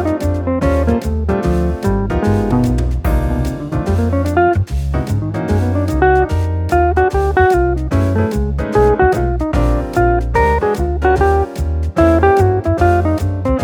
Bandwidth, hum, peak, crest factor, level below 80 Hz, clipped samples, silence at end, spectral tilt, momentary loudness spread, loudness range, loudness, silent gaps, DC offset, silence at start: 17.5 kHz; none; 0 dBFS; 14 dB; -20 dBFS; under 0.1%; 0 s; -8 dB/octave; 6 LU; 3 LU; -15 LUFS; none; under 0.1%; 0 s